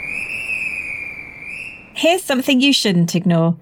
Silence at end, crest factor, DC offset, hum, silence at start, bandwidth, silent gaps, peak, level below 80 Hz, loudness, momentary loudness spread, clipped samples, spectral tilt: 0.05 s; 16 dB; under 0.1%; none; 0 s; 19 kHz; none; -4 dBFS; -54 dBFS; -17 LUFS; 15 LU; under 0.1%; -4.5 dB/octave